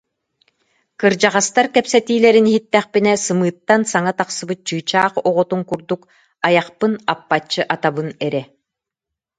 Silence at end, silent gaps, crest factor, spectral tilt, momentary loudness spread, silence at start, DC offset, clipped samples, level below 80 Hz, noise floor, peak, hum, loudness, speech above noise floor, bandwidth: 0.95 s; none; 18 dB; -4 dB/octave; 9 LU; 1 s; under 0.1%; under 0.1%; -64 dBFS; -84 dBFS; 0 dBFS; none; -17 LUFS; 67 dB; 9.6 kHz